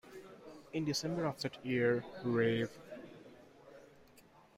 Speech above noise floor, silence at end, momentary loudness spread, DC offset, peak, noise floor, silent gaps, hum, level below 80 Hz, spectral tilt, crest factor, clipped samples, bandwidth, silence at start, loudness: 28 dB; 0.35 s; 24 LU; under 0.1%; -20 dBFS; -63 dBFS; none; none; -72 dBFS; -5.5 dB/octave; 20 dB; under 0.1%; 16 kHz; 0.05 s; -36 LUFS